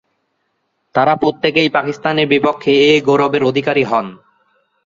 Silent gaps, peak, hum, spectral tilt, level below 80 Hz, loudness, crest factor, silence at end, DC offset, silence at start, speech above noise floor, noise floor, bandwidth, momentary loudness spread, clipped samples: none; -2 dBFS; none; -5.5 dB/octave; -56 dBFS; -14 LUFS; 14 dB; 0.7 s; under 0.1%; 0.95 s; 54 dB; -68 dBFS; 7.6 kHz; 7 LU; under 0.1%